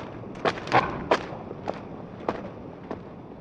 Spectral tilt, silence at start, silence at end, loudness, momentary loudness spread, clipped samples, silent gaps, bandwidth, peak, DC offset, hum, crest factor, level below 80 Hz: -5.5 dB/octave; 0 s; 0 s; -29 LUFS; 16 LU; under 0.1%; none; 10 kHz; -8 dBFS; under 0.1%; none; 22 dB; -54 dBFS